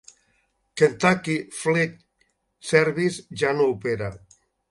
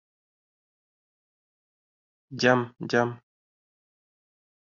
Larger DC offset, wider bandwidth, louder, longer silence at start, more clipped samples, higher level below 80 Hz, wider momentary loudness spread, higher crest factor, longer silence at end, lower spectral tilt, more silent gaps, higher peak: neither; first, 11.5 kHz vs 7.4 kHz; about the same, -23 LUFS vs -25 LUFS; second, 0.75 s vs 2.3 s; neither; first, -58 dBFS vs -74 dBFS; about the same, 10 LU vs 9 LU; about the same, 22 dB vs 26 dB; second, 0.55 s vs 1.45 s; about the same, -5 dB/octave vs -4 dB/octave; neither; first, -2 dBFS vs -6 dBFS